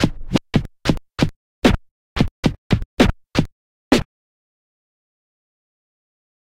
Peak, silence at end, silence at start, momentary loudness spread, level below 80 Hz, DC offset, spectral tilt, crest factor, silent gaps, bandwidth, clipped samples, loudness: 0 dBFS; 2.45 s; 0 s; 6 LU; -32 dBFS; under 0.1%; -6 dB/octave; 22 dB; 1.36-1.62 s, 1.91-2.16 s, 2.31-2.43 s, 2.58-2.70 s, 2.85-2.97 s, 3.52-3.91 s; 16 kHz; under 0.1%; -21 LUFS